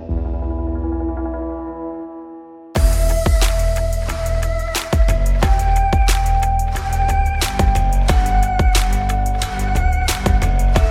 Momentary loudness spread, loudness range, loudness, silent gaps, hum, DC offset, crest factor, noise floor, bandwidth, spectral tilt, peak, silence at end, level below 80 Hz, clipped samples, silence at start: 9 LU; 3 LU; -19 LUFS; none; none; under 0.1%; 14 dB; -37 dBFS; 16 kHz; -5 dB/octave; -2 dBFS; 0 s; -18 dBFS; under 0.1%; 0 s